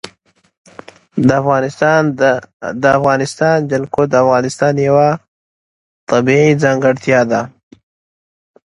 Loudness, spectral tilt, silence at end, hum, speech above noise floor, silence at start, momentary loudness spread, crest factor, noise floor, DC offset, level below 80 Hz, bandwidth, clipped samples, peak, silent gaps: -13 LUFS; -6.5 dB/octave; 1.25 s; none; 40 dB; 0.05 s; 8 LU; 14 dB; -53 dBFS; under 0.1%; -52 dBFS; 11.5 kHz; under 0.1%; 0 dBFS; 0.57-0.65 s, 2.53-2.60 s, 5.28-6.07 s